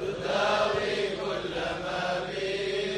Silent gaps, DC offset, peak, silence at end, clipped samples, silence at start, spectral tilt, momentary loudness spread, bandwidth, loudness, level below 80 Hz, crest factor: none; under 0.1%; -14 dBFS; 0 s; under 0.1%; 0 s; -4 dB/octave; 6 LU; 12 kHz; -29 LUFS; -54 dBFS; 16 dB